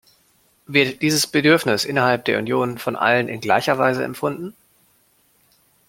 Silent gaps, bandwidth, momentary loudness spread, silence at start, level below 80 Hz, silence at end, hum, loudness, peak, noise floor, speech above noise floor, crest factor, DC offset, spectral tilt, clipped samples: none; 16.5 kHz; 9 LU; 0.7 s; -62 dBFS; 1.4 s; none; -19 LUFS; -2 dBFS; -60 dBFS; 41 dB; 20 dB; under 0.1%; -4 dB/octave; under 0.1%